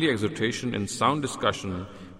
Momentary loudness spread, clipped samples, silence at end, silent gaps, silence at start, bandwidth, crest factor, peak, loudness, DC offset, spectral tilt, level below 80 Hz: 9 LU; under 0.1%; 0 s; none; 0 s; 15 kHz; 18 dB; -10 dBFS; -27 LUFS; under 0.1%; -4.5 dB/octave; -58 dBFS